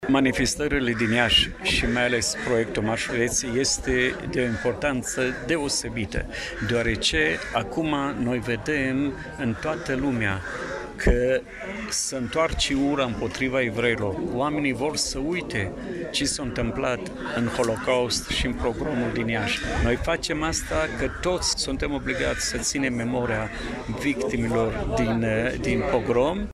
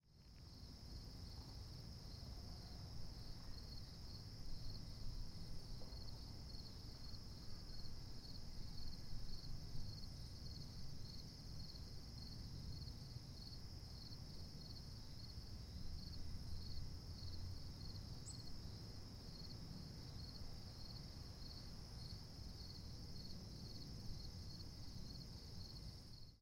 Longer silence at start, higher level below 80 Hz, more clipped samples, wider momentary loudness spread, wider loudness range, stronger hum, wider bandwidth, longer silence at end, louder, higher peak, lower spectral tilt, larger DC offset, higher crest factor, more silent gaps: about the same, 0 s vs 0.05 s; first, -38 dBFS vs -56 dBFS; neither; first, 6 LU vs 2 LU; about the same, 4 LU vs 2 LU; neither; second, 14.5 kHz vs 16 kHz; about the same, 0 s vs 0 s; first, -25 LUFS vs -55 LUFS; first, -6 dBFS vs -34 dBFS; about the same, -4 dB/octave vs -5 dB/octave; neither; about the same, 20 dB vs 16 dB; neither